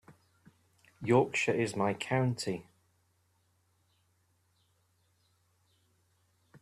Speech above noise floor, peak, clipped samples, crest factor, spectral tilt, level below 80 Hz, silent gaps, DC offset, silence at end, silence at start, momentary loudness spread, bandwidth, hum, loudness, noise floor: 43 dB; -14 dBFS; under 0.1%; 24 dB; -5.5 dB/octave; -72 dBFS; none; under 0.1%; 0.05 s; 0.1 s; 11 LU; 13.5 kHz; none; -31 LUFS; -73 dBFS